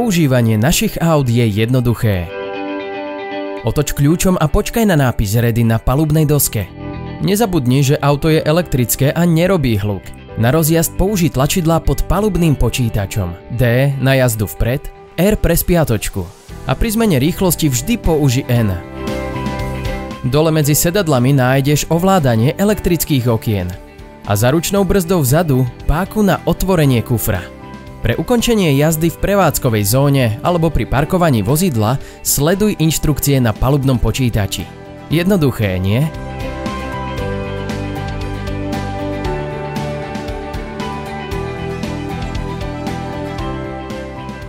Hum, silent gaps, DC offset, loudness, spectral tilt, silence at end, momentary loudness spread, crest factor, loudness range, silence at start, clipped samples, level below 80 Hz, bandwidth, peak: none; none; under 0.1%; -16 LUFS; -5.5 dB/octave; 0 s; 11 LU; 14 dB; 8 LU; 0 s; under 0.1%; -28 dBFS; 16.5 kHz; -2 dBFS